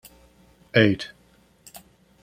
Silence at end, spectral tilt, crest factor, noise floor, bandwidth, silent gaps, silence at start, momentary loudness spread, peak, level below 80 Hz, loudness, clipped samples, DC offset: 0.45 s; -6 dB/octave; 24 dB; -58 dBFS; 16 kHz; none; 0.75 s; 26 LU; -2 dBFS; -60 dBFS; -21 LUFS; under 0.1%; under 0.1%